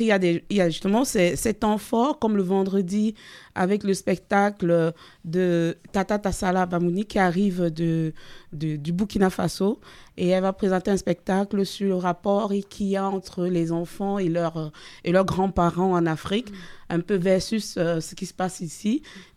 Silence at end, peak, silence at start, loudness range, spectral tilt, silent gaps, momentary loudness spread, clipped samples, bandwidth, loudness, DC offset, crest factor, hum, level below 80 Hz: 0.15 s; -6 dBFS; 0 s; 2 LU; -6 dB/octave; none; 8 LU; under 0.1%; 15 kHz; -24 LUFS; under 0.1%; 18 dB; none; -48 dBFS